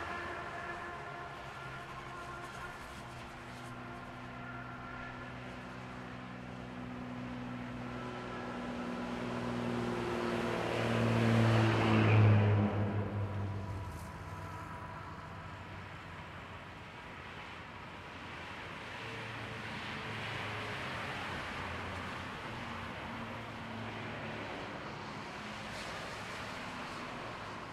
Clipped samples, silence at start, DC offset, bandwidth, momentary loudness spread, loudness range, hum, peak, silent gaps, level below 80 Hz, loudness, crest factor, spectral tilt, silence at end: under 0.1%; 0 s; under 0.1%; 12 kHz; 16 LU; 15 LU; none; -16 dBFS; none; -58 dBFS; -38 LUFS; 22 dB; -6.5 dB/octave; 0 s